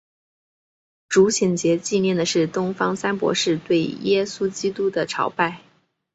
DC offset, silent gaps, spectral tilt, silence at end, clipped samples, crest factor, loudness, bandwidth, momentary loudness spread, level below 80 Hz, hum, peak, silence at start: under 0.1%; none; -4.5 dB/octave; 0.55 s; under 0.1%; 18 dB; -21 LUFS; 8.2 kHz; 6 LU; -62 dBFS; none; -4 dBFS; 1.1 s